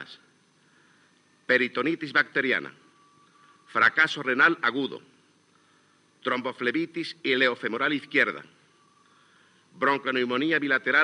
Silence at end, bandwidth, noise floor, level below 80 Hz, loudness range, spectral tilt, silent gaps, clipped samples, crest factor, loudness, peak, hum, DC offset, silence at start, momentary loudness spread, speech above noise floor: 0 s; 10.5 kHz; -63 dBFS; under -90 dBFS; 3 LU; -4.5 dB/octave; none; under 0.1%; 22 dB; -25 LUFS; -6 dBFS; none; under 0.1%; 0 s; 12 LU; 37 dB